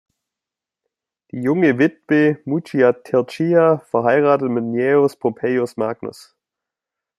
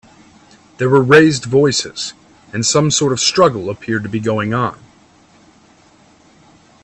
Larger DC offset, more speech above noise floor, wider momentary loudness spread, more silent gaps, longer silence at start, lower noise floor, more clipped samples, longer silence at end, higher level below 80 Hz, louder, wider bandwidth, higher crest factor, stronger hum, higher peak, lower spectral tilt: neither; first, 70 dB vs 35 dB; second, 9 LU vs 14 LU; neither; first, 1.35 s vs 0.8 s; first, -87 dBFS vs -49 dBFS; neither; second, 1.1 s vs 2.1 s; second, -66 dBFS vs -52 dBFS; second, -18 LUFS vs -14 LUFS; first, 12.5 kHz vs 9.4 kHz; about the same, 16 dB vs 16 dB; neither; about the same, -2 dBFS vs 0 dBFS; first, -8 dB/octave vs -4 dB/octave